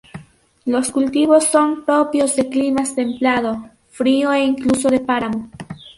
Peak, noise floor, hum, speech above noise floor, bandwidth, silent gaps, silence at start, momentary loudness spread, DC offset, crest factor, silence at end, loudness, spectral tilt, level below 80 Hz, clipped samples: -2 dBFS; -45 dBFS; none; 29 dB; 11.5 kHz; none; 0.15 s; 11 LU; under 0.1%; 16 dB; 0.05 s; -17 LUFS; -4 dB/octave; -52 dBFS; under 0.1%